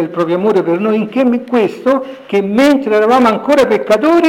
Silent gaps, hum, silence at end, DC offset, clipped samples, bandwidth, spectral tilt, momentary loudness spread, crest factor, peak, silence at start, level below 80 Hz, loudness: none; none; 0 s; under 0.1%; under 0.1%; 17 kHz; -6 dB/octave; 5 LU; 8 dB; -4 dBFS; 0 s; -54 dBFS; -12 LUFS